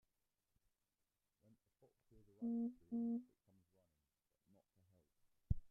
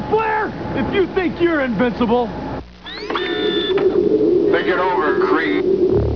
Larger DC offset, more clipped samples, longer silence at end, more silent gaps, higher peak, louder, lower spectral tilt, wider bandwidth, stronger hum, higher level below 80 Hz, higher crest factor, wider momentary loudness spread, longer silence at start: second, under 0.1% vs 0.4%; neither; about the same, 0.05 s vs 0 s; neither; second, -24 dBFS vs -4 dBFS; second, -46 LUFS vs -17 LUFS; first, -14 dB/octave vs -7.5 dB/octave; second, 1.3 kHz vs 5.4 kHz; neither; second, -60 dBFS vs -38 dBFS; first, 26 dB vs 14 dB; second, 5 LU vs 9 LU; first, 2.4 s vs 0 s